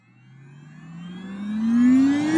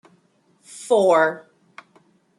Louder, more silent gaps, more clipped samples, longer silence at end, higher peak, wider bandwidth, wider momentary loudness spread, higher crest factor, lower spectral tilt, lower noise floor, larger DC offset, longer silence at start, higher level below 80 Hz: about the same, -19 LUFS vs -18 LUFS; neither; neither; second, 0 s vs 1 s; second, -10 dBFS vs -6 dBFS; second, 9.6 kHz vs 12.5 kHz; about the same, 22 LU vs 23 LU; about the same, 14 dB vs 18 dB; first, -6.5 dB/octave vs -4 dB/octave; second, -49 dBFS vs -61 dBFS; neither; about the same, 0.85 s vs 0.75 s; first, -66 dBFS vs -78 dBFS